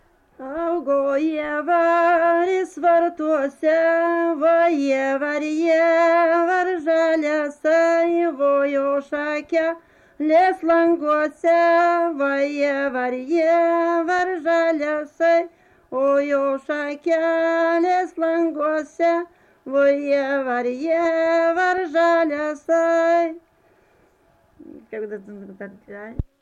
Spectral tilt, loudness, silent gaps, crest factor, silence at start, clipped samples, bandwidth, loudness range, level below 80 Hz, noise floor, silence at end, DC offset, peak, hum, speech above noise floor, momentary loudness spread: -5.5 dB/octave; -20 LUFS; none; 12 dB; 0.4 s; under 0.1%; 8.2 kHz; 3 LU; -52 dBFS; -59 dBFS; 0.2 s; under 0.1%; -8 dBFS; none; 39 dB; 9 LU